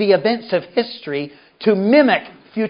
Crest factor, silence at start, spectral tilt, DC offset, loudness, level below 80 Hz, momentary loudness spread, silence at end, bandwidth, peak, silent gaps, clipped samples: 16 dB; 0 s; -10.5 dB/octave; under 0.1%; -17 LUFS; -70 dBFS; 13 LU; 0 s; 5.4 kHz; 0 dBFS; none; under 0.1%